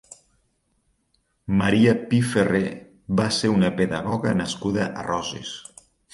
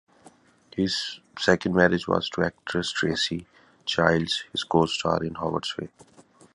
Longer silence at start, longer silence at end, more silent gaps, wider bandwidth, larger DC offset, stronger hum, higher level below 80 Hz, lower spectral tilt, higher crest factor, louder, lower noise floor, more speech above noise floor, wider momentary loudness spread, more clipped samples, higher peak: first, 1.5 s vs 0.75 s; first, 0.5 s vs 0.35 s; neither; about the same, 11.5 kHz vs 11.5 kHz; neither; neither; about the same, -50 dBFS vs -52 dBFS; about the same, -5.5 dB/octave vs -4.5 dB/octave; second, 18 dB vs 24 dB; first, -22 LUFS vs -25 LUFS; first, -69 dBFS vs -55 dBFS; first, 48 dB vs 30 dB; about the same, 14 LU vs 12 LU; neither; second, -6 dBFS vs -2 dBFS